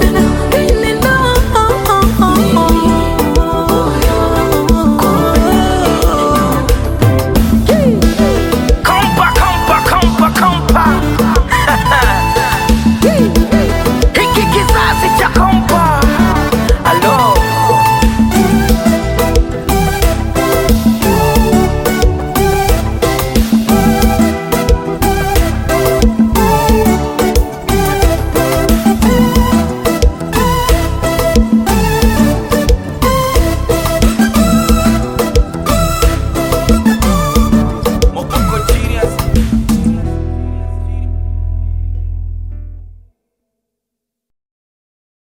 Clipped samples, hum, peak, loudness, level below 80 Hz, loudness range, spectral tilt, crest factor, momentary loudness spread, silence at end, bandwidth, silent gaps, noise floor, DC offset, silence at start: under 0.1%; none; 0 dBFS; -11 LUFS; -16 dBFS; 5 LU; -5.5 dB/octave; 10 dB; 5 LU; 2.3 s; 17 kHz; none; -78 dBFS; under 0.1%; 0 s